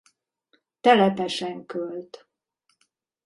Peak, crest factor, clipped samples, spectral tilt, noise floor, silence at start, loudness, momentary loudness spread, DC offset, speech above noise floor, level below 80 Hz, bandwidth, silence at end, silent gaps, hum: -4 dBFS; 22 dB; under 0.1%; -5.5 dB/octave; -73 dBFS; 0.85 s; -23 LUFS; 18 LU; under 0.1%; 50 dB; -72 dBFS; 11.5 kHz; 1.1 s; none; none